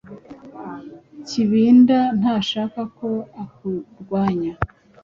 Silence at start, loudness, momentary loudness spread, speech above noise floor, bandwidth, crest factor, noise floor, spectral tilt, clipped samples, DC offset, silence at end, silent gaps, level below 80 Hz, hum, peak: 0.1 s; -20 LUFS; 25 LU; 21 dB; 7.4 kHz; 18 dB; -40 dBFS; -6.5 dB/octave; under 0.1%; under 0.1%; 0.35 s; none; -48 dBFS; none; -2 dBFS